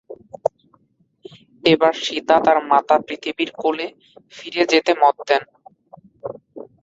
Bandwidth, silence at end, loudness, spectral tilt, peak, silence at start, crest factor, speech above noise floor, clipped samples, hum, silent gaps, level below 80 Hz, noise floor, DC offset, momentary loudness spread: 7.8 kHz; 0.2 s; -18 LUFS; -4 dB/octave; 0 dBFS; 0.1 s; 20 dB; 44 dB; under 0.1%; none; none; -64 dBFS; -62 dBFS; under 0.1%; 19 LU